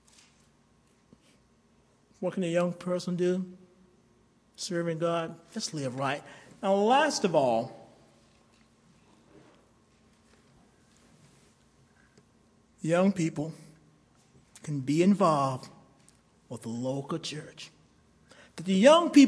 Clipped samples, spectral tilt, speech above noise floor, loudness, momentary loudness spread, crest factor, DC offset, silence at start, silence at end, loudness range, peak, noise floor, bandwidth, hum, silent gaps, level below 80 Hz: under 0.1%; -5.5 dB/octave; 38 dB; -28 LUFS; 19 LU; 22 dB; under 0.1%; 2.2 s; 0 s; 6 LU; -8 dBFS; -65 dBFS; 11 kHz; none; none; -72 dBFS